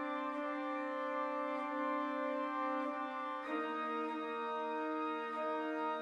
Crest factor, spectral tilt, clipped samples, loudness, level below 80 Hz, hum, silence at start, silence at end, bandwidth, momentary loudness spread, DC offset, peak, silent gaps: 12 dB; -4.5 dB/octave; under 0.1%; -39 LUFS; -88 dBFS; none; 0 s; 0 s; 10 kHz; 2 LU; under 0.1%; -26 dBFS; none